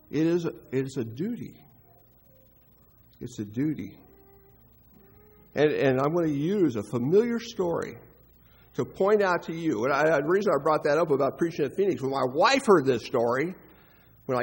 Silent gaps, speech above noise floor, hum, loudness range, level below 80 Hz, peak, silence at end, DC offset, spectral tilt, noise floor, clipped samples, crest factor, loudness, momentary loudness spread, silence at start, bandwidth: none; 33 dB; none; 14 LU; -62 dBFS; -8 dBFS; 0 s; under 0.1%; -6 dB/octave; -58 dBFS; under 0.1%; 20 dB; -26 LUFS; 15 LU; 0.1 s; 16 kHz